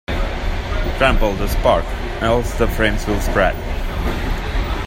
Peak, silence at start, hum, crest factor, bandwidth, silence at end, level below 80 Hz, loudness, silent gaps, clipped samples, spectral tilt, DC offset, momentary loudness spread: 0 dBFS; 0.1 s; none; 18 dB; 16.5 kHz; 0 s; -22 dBFS; -19 LUFS; none; under 0.1%; -5.5 dB/octave; under 0.1%; 7 LU